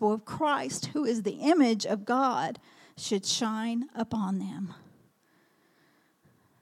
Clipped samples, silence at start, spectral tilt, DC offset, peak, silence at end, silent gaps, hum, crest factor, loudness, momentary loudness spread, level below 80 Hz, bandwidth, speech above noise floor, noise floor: under 0.1%; 0 s; -4 dB/octave; under 0.1%; -12 dBFS; 1.85 s; none; none; 18 dB; -29 LUFS; 12 LU; -74 dBFS; 14.5 kHz; 38 dB; -67 dBFS